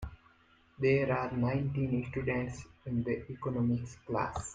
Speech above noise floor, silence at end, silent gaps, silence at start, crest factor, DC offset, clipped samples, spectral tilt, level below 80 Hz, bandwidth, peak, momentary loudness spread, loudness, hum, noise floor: 32 dB; 0 s; none; 0 s; 16 dB; under 0.1%; under 0.1%; -7.5 dB/octave; -54 dBFS; 9.4 kHz; -18 dBFS; 8 LU; -33 LUFS; none; -65 dBFS